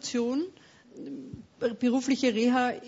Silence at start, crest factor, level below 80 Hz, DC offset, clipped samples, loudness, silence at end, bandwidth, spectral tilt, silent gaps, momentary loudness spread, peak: 0.05 s; 16 dB; -66 dBFS; under 0.1%; under 0.1%; -28 LUFS; 0 s; 8 kHz; -4 dB/octave; none; 17 LU; -14 dBFS